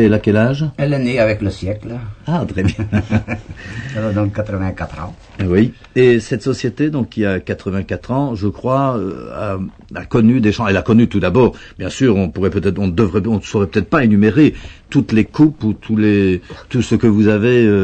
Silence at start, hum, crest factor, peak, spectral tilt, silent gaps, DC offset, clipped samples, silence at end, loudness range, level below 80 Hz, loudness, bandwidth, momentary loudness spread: 0 s; none; 14 dB; 0 dBFS; -7.5 dB/octave; none; under 0.1%; under 0.1%; 0 s; 5 LU; -38 dBFS; -16 LUFS; 8.8 kHz; 13 LU